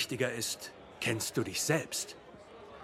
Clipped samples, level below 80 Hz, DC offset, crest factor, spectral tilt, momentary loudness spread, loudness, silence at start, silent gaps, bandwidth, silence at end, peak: under 0.1%; -68 dBFS; under 0.1%; 20 dB; -3 dB/octave; 20 LU; -34 LUFS; 0 s; none; 16 kHz; 0 s; -16 dBFS